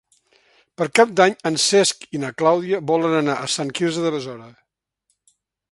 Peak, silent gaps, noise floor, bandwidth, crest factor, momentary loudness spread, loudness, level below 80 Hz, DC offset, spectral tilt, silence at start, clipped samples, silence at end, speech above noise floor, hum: 0 dBFS; none; -72 dBFS; 11.5 kHz; 20 dB; 12 LU; -19 LUFS; -68 dBFS; under 0.1%; -3.5 dB/octave; 0.8 s; under 0.1%; 1.2 s; 53 dB; none